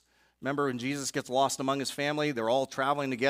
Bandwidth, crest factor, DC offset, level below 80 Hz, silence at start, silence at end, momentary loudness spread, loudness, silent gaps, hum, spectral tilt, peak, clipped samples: 16 kHz; 18 dB; under 0.1%; -72 dBFS; 0.4 s; 0 s; 4 LU; -30 LUFS; none; none; -4 dB/octave; -12 dBFS; under 0.1%